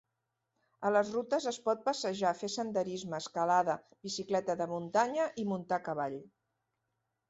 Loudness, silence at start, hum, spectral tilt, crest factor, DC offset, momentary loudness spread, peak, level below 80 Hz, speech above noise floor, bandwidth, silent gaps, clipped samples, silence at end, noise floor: -34 LUFS; 0.8 s; none; -4.5 dB/octave; 20 dB; under 0.1%; 9 LU; -14 dBFS; -76 dBFS; 52 dB; 8.2 kHz; none; under 0.1%; 1 s; -85 dBFS